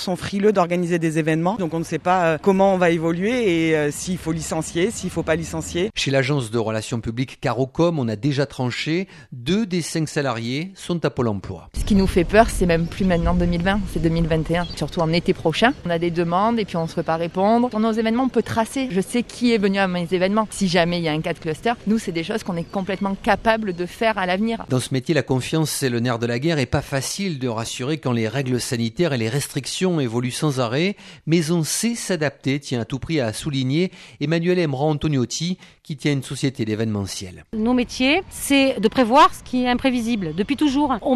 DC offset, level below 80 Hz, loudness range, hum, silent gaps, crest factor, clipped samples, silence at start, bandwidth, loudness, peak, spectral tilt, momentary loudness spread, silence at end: under 0.1%; -38 dBFS; 4 LU; none; none; 20 dB; under 0.1%; 0 s; 14 kHz; -21 LUFS; 0 dBFS; -5.5 dB/octave; 7 LU; 0 s